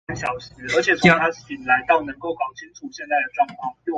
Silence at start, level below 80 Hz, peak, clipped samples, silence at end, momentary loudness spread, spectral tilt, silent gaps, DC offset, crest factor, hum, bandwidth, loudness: 0.1 s; -52 dBFS; -2 dBFS; under 0.1%; 0 s; 16 LU; -5 dB/octave; none; under 0.1%; 20 dB; none; 9.2 kHz; -21 LUFS